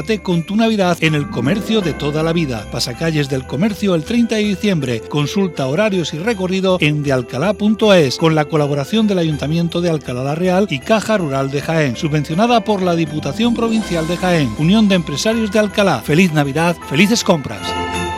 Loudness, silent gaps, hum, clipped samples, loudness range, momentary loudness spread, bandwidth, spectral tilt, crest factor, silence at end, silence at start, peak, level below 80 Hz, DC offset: -16 LUFS; none; none; under 0.1%; 3 LU; 6 LU; 15 kHz; -5.5 dB/octave; 16 dB; 0 s; 0 s; 0 dBFS; -40 dBFS; under 0.1%